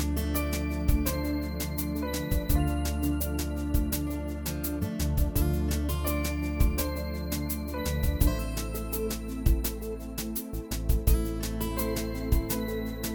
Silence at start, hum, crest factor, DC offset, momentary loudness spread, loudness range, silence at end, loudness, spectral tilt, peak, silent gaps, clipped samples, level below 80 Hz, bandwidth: 0 s; none; 18 dB; under 0.1%; 6 LU; 1 LU; 0 s; -30 LUFS; -5.5 dB/octave; -10 dBFS; none; under 0.1%; -32 dBFS; 19 kHz